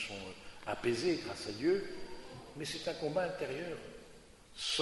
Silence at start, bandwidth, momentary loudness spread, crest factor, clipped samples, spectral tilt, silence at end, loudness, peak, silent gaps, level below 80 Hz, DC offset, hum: 0 s; 11.5 kHz; 16 LU; 20 dB; under 0.1%; -4 dB/octave; 0 s; -38 LUFS; -20 dBFS; none; -62 dBFS; under 0.1%; none